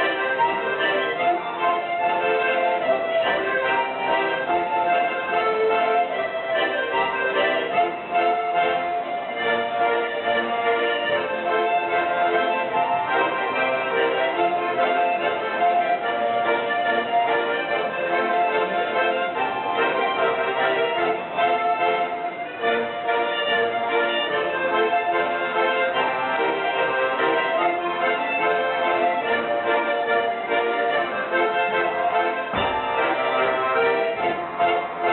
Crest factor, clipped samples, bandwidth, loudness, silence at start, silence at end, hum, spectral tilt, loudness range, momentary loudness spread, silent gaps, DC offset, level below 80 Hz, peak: 12 dB; under 0.1%; 4.3 kHz; -22 LUFS; 0 s; 0 s; none; -0.5 dB/octave; 1 LU; 3 LU; none; under 0.1%; -62 dBFS; -10 dBFS